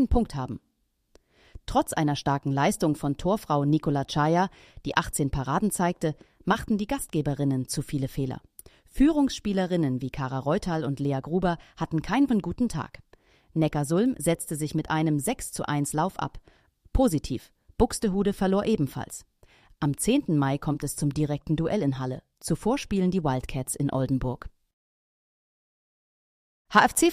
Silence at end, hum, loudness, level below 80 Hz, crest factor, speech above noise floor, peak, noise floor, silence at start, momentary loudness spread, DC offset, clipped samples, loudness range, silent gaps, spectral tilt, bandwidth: 0 s; none; -27 LUFS; -42 dBFS; 22 dB; 46 dB; -4 dBFS; -72 dBFS; 0 s; 10 LU; under 0.1%; under 0.1%; 3 LU; 24.73-26.65 s; -5.5 dB/octave; 15.5 kHz